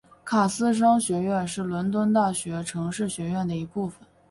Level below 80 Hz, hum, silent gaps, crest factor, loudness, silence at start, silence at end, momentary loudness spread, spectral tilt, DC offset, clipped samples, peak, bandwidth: -58 dBFS; none; none; 16 dB; -25 LUFS; 0.25 s; 0.35 s; 9 LU; -5.5 dB/octave; under 0.1%; under 0.1%; -10 dBFS; 11.5 kHz